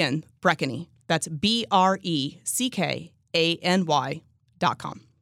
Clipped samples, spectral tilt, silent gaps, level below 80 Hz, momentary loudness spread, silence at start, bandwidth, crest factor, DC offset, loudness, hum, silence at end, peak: under 0.1%; -4 dB/octave; none; -66 dBFS; 13 LU; 0 s; 16.5 kHz; 20 dB; under 0.1%; -25 LUFS; none; 0.25 s; -6 dBFS